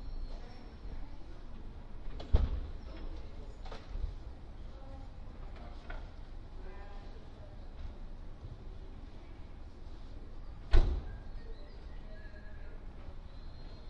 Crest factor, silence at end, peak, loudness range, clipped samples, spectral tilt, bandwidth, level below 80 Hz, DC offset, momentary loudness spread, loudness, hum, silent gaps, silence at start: 26 dB; 0 s; -10 dBFS; 10 LU; under 0.1%; -7.5 dB/octave; 6 kHz; -38 dBFS; under 0.1%; 17 LU; -45 LUFS; none; none; 0 s